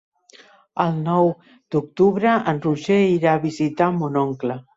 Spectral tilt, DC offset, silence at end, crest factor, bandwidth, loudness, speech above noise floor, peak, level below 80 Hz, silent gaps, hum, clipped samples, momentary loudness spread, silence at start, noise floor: -7.5 dB/octave; under 0.1%; 0.15 s; 18 dB; 8 kHz; -20 LUFS; 31 dB; -4 dBFS; -62 dBFS; none; none; under 0.1%; 8 LU; 0.75 s; -50 dBFS